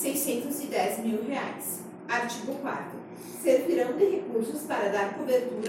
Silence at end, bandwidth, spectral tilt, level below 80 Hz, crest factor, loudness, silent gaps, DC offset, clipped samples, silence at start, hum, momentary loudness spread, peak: 0 s; 17 kHz; -4 dB/octave; -76 dBFS; 18 dB; -29 LUFS; none; under 0.1%; under 0.1%; 0 s; none; 10 LU; -12 dBFS